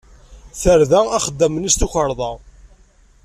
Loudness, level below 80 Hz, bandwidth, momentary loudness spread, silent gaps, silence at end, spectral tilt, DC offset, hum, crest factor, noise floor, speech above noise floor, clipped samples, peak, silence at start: -17 LUFS; -30 dBFS; 14.5 kHz; 14 LU; none; 0.6 s; -4 dB/octave; under 0.1%; none; 16 dB; -51 dBFS; 35 dB; under 0.1%; -2 dBFS; 0.3 s